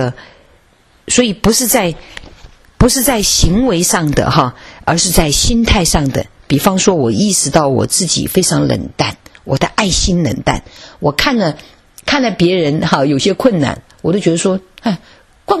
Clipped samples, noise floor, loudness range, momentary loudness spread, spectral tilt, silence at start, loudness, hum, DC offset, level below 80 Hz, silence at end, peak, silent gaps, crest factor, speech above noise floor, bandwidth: 0.1%; -50 dBFS; 3 LU; 9 LU; -4 dB/octave; 0 s; -13 LUFS; none; under 0.1%; -26 dBFS; 0 s; 0 dBFS; none; 14 dB; 37 dB; 14 kHz